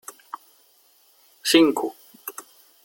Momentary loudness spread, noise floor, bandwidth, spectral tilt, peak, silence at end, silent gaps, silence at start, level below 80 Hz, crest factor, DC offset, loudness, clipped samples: 24 LU; -59 dBFS; 17 kHz; -2.5 dB/octave; -2 dBFS; 0.45 s; none; 1.45 s; -72 dBFS; 24 dB; under 0.1%; -20 LUFS; under 0.1%